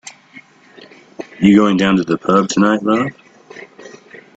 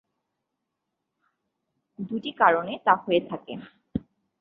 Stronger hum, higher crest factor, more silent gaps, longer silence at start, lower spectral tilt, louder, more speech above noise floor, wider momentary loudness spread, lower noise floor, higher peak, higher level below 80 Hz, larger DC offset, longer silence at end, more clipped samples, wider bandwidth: neither; second, 16 dB vs 24 dB; neither; second, 1.2 s vs 2 s; second, -6 dB/octave vs -8 dB/octave; first, -14 LUFS vs -25 LUFS; second, 31 dB vs 57 dB; first, 24 LU vs 18 LU; second, -43 dBFS vs -82 dBFS; first, 0 dBFS vs -4 dBFS; first, -52 dBFS vs -60 dBFS; neither; about the same, 0.5 s vs 0.4 s; neither; first, 8 kHz vs 5 kHz